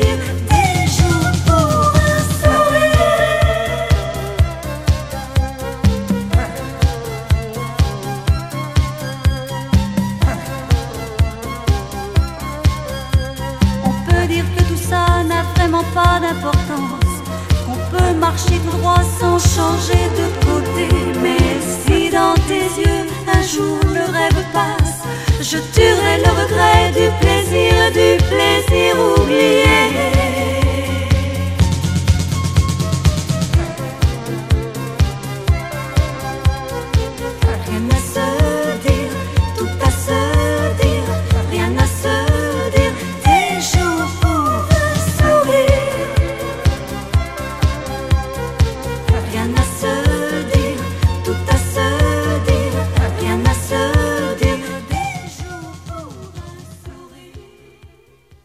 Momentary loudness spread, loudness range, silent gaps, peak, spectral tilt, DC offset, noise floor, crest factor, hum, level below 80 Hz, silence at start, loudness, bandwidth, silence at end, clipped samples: 8 LU; 6 LU; none; 0 dBFS; -5.5 dB/octave; under 0.1%; -49 dBFS; 16 dB; none; -22 dBFS; 0 s; -16 LUFS; 15.5 kHz; 0.6 s; under 0.1%